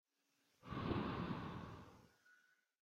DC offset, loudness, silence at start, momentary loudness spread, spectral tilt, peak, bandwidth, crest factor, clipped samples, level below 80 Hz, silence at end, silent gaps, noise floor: under 0.1%; -46 LUFS; 0.65 s; 19 LU; -7.5 dB/octave; -28 dBFS; 15 kHz; 22 dB; under 0.1%; -64 dBFS; 0.5 s; none; -83 dBFS